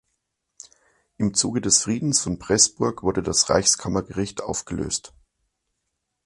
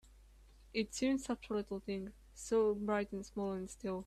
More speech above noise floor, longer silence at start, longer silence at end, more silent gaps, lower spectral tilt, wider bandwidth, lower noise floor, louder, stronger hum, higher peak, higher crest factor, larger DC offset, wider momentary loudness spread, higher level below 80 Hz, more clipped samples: first, 56 dB vs 24 dB; first, 1.2 s vs 0.1 s; first, 1.2 s vs 0 s; neither; second, -3 dB/octave vs -5 dB/octave; second, 11.5 kHz vs 13.5 kHz; first, -78 dBFS vs -61 dBFS; first, -21 LUFS vs -38 LUFS; neither; first, -2 dBFS vs -24 dBFS; first, 22 dB vs 16 dB; neither; about the same, 11 LU vs 10 LU; first, -48 dBFS vs -60 dBFS; neither